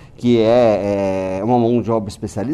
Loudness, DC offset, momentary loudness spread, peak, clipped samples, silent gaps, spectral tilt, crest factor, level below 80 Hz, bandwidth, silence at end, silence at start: -17 LUFS; under 0.1%; 8 LU; -4 dBFS; under 0.1%; none; -7.5 dB/octave; 14 dB; -44 dBFS; 11.5 kHz; 0 s; 0.2 s